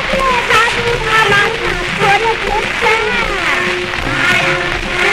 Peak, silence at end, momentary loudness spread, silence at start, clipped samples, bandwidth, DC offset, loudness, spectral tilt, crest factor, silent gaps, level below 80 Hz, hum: 0 dBFS; 0 s; 5 LU; 0 s; under 0.1%; 16 kHz; under 0.1%; -12 LUFS; -3 dB/octave; 12 dB; none; -30 dBFS; none